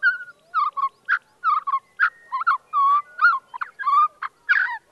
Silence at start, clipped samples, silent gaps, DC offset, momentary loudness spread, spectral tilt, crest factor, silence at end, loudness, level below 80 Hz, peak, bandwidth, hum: 0 s; under 0.1%; none; under 0.1%; 8 LU; 0.5 dB/octave; 16 dB; 0.15 s; -21 LUFS; -80 dBFS; -8 dBFS; 10 kHz; none